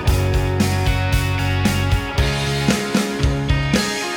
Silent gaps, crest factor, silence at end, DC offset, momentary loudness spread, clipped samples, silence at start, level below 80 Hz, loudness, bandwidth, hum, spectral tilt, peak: none; 16 dB; 0 s; under 0.1%; 2 LU; under 0.1%; 0 s; -26 dBFS; -19 LUFS; over 20 kHz; none; -5 dB/octave; -2 dBFS